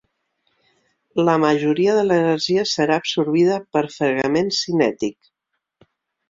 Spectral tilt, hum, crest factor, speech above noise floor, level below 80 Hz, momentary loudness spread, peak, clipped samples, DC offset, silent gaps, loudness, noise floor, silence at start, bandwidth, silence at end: -5 dB/octave; none; 16 dB; 51 dB; -62 dBFS; 5 LU; -4 dBFS; under 0.1%; under 0.1%; none; -19 LUFS; -70 dBFS; 1.15 s; 7.8 kHz; 1.2 s